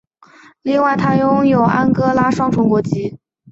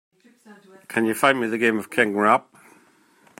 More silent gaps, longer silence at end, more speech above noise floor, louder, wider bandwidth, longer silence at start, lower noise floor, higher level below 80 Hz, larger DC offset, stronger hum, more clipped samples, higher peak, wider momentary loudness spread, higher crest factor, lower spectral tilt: neither; second, 0.35 s vs 1 s; second, 32 dB vs 36 dB; first, -15 LUFS vs -21 LUFS; second, 8 kHz vs 16.5 kHz; first, 0.65 s vs 0.5 s; second, -46 dBFS vs -57 dBFS; first, -48 dBFS vs -72 dBFS; neither; neither; neither; about the same, -2 dBFS vs -2 dBFS; first, 9 LU vs 5 LU; second, 14 dB vs 22 dB; first, -8 dB/octave vs -4.5 dB/octave